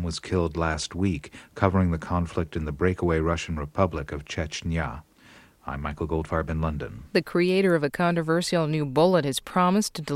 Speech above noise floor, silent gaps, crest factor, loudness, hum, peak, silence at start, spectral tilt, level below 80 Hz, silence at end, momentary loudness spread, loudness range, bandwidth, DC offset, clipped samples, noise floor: 28 dB; none; 20 dB; -26 LUFS; none; -4 dBFS; 0 s; -6 dB/octave; -40 dBFS; 0 s; 11 LU; 6 LU; 15 kHz; under 0.1%; under 0.1%; -53 dBFS